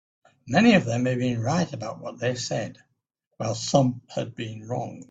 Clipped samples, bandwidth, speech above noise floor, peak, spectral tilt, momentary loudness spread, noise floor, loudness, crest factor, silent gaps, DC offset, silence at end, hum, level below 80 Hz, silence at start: under 0.1%; 8 kHz; 51 dB; -4 dBFS; -5.5 dB/octave; 15 LU; -76 dBFS; -25 LUFS; 22 dB; 3.27-3.31 s; under 0.1%; 0.1 s; none; -60 dBFS; 0.45 s